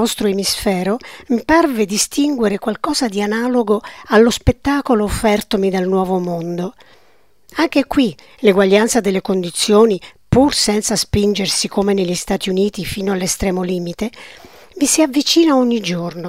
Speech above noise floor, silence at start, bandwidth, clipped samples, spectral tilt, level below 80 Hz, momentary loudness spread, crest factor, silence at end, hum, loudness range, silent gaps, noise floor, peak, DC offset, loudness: 40 dB; 0 s; 16 kHz; under 0.1%; -4 dB/octave; -38 dBFS; 9 LU; 16 dB; 0 s; none; 4 LU; none; -56 dBFS; 0 dBFS; 0.3%; -16 LUFS